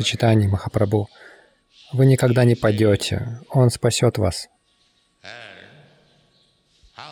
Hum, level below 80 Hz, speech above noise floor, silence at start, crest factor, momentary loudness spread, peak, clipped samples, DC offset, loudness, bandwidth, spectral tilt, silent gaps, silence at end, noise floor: none; -48 dBFS; 45 dB; 0 s; 14 dB; 22 LU; -6 dBFS; under 0.1%; under 0.1%; -19 LUFS; 15 kHz; -6 dB/octave; none; 0 s; -63 dBFS